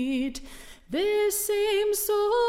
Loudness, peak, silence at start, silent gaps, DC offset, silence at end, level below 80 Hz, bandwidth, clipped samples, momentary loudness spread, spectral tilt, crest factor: -26 LUFS; -14 dBFS; 0 s; none; under 0.1%; 0 s; -50 dBFS; 17 kHz; under 0.1%; 17 LU; -2 dB/octave; 12 dB